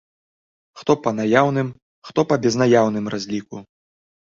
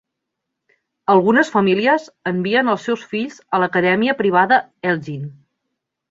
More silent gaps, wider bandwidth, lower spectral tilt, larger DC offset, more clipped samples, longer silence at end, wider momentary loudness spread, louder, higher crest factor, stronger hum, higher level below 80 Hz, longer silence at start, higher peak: first, 1.82-2.02 s vs none; about the same, 7.6 kHz vs 7.8 kHz; about the same, -6 dB/octave vs -6.5 dB/octave; neither; neither; about the same, 0.7 s vs 0.8 s; about the same, 13 LU vs 11 LU; second, -20 LUFS vs -17 LUFS; about the same, 20 dB vs 16 dB; neither; about the same, -60 dBFS vs -62 dBFS; second, 0.75 s vs 1.1 s; about the same, -2 dBFS vs -2 dBFS